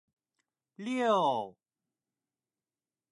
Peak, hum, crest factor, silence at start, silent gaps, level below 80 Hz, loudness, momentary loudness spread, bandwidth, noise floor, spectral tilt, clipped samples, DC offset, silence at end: -16 dBFS; none; 20 dB; 0.8 s; none; -88 dBFS; -30 LUFS; 16 LU; 11 kHz; under -90 dBFS; -5 dB/octave; under 0.1%; under 0.1%; 1.6 s